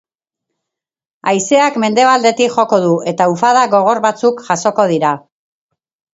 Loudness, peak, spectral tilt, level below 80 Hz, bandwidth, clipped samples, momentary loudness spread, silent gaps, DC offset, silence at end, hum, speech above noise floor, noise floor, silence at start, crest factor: -13 LUFS; 0 dBFS; -4.5 dB/octave; -64 dBFS; 8 kHz; under 0.1%; 6 LU; none; under 0.1%; 0.95 s; none; 68 dB; -81 dBFS; 1.25 s; 14 dB